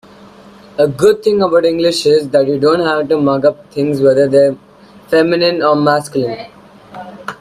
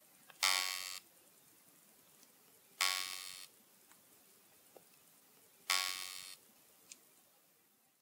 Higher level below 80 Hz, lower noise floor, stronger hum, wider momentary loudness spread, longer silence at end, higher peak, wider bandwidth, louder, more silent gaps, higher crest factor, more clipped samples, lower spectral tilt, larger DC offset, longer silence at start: first, -52 dBFS vs under -90 dBFS; second, -39 dBFS vs -72 dBFS; neither; second, 16 LU vs 25 LU; second, 0.05 s vs 1.1 s; first, 0 dBFS vs -16 dBFS; second, 14 kHz vs 19 kHz; first, -13 LUFS vs -37 LUFS; neither; second, 12 dB vs 28 dB; neither; first, -5.5 dB/octave vs 3 dB/octave; neither; first, 0.8 s vs 0.4 s